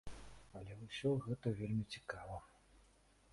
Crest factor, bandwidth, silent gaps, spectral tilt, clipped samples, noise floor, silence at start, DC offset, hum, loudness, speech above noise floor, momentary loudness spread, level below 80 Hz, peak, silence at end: 18 dB; 11.5 kHz; none; -7 dB/octave; under 0.1%; -70 dBFS; 0.05 s; under 0.1%; none; -43 LUFS; 28 dB; 17 LU; -62 dBFS; -26 dBFS; 0.5 s